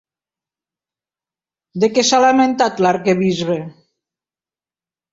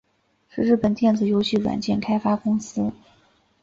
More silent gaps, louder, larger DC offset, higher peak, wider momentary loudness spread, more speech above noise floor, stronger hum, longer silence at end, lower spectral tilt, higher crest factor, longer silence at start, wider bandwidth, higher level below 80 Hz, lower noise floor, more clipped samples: neither; first, -15 LUFS vs -22 LUFS; neither; first, -2 dBFS vs -8 dBFS; first, 12 LU vs 8 LU; first, over 75 dB vs 42 dB; neither; first, 1.4 s vs 0.7 s; second, -4.5 dB/octave vs -6.5 dB/octave; about the same, 18 dB vs 16 dB; first, 1.75 s vs 0.55 s; about the same, 7.8 kHz vs 7.6 kHz; second, -60 dBFS vs -54 dBFS; first, under -90 dBFS vs -63 dBFS; neither